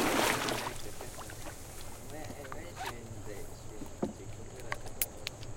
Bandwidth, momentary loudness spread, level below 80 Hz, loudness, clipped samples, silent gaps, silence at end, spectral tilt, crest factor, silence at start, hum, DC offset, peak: 17 kHz; 15 LU; -50 dBFS; -38 LUFS; under 0.1%; none; 0 s; -3 dB/octave; 28 dB; 0 s; none; under 0.1%; -10 dBFS